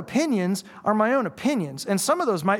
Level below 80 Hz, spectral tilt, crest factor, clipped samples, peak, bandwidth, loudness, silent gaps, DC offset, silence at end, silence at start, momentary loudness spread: -68 dBFS; -5 dB/octave; 16 dB; under 0.1%; -8 dBFS; 18 kHz; -24 LUFS; none; under 0.1%; 0 s; 0 s; 6 LU